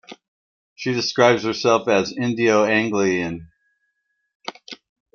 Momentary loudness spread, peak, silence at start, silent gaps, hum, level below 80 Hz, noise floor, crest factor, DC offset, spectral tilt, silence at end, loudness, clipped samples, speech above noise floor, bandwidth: 19 LU; -2 dBFS; 0.1 s; 0.28-0.76 s, 4.35-4.40 s; none; -62 dBFS; -73 dBFS; 18 dB; under 0.1%; -4.5 dB/octave; 0.4 s; -19 LUFS; under 0.1%; 54 dB; 7.2 kHz